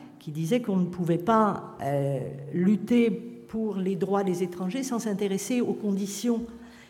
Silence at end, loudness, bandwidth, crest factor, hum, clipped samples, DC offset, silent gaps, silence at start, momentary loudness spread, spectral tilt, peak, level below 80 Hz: 0.05 s; -27 LUFS; 17 kHz; 18 dB; none; under 0.1%; under 0.1%; none; 0 s; 10 LU; -6.5 dB/octave; -10 dBFS; -64 dBFS